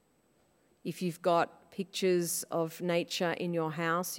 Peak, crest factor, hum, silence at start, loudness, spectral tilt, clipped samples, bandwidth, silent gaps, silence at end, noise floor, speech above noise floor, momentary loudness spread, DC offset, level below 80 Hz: -16 dBFS; 18 dB; none; 0.85 s; -32 LUFS; -4.5 dB/octave; under 0.1%; 16.5 kHz; none; 0 s; -70 dBFS; 38 dB; 9 LU; under 0.1%; -82 dBFS